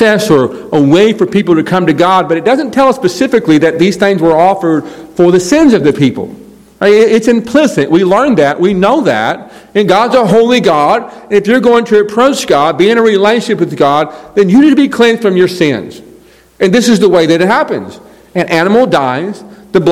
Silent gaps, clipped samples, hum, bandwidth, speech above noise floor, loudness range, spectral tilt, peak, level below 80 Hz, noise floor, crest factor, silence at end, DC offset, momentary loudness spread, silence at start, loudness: none; 3%; none; 15.5 kHz; 32 dB; 2 LU; -5.5 dB/octave; 0 dBFS; -46 dBFS; -40 dBFS; 8 dB; 0 s; 0.3%; 7 LU; 0 s; -9 LUFS